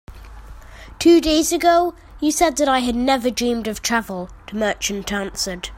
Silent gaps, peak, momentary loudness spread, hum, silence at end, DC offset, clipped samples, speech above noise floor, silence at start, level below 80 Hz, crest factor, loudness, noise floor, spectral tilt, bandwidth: none; -4 dBFS; 10 LU; none; 0 s; under 0.1%; under 0.1%; 20 dB; 0.1 s; -40 dBFS; 16 dB; -19 LUFS; -38 dBFS; -3 dB/octave; 16.5 kHz